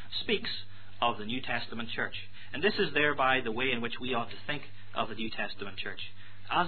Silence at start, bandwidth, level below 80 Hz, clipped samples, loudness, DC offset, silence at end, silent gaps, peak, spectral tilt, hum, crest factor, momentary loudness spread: 0 s; 4.6 kHz; -60 dBFS; under 0.1%; -32 LUFS; 2%; 0 s; none; -12 dBFS; -7 dB/octave; none; 20 dB; 13 LU